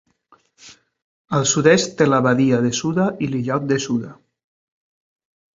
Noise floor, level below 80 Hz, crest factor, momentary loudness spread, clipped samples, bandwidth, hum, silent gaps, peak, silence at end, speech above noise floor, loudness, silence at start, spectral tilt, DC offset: -57 dBFS; -58 dBFS; 20 dB; 9 LU; under 0.1%; 7.8 kHz; none; 1.02-1.25 s; -2 dBFS; 1.45 s; 40 dB; -18 LUFS; 0.65 s; -5 dB/octave; under 0.1%